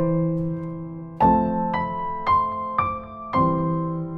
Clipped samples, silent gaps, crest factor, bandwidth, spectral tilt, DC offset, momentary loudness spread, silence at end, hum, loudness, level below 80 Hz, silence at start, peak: under 0.1%; none; 16 dB; 5.4 kHz; -10.5 dB/octave; under 0.1%; 12 LU; 0 s; none; -23 LUFS; -46 dBFS; 0 s; -8 dBFS